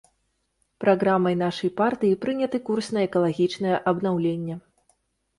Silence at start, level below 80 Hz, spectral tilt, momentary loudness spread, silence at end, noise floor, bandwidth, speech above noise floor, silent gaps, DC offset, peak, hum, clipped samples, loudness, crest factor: 0.8 s; -64 dBFS; -7 dB/octave; 5 LU; 0.8 s; -73 dBFS; 11.5 kHz; 50 dB; none; under 0.1%; -8 dBFS; none; under 0.1%; -24 LUFS; 18 dB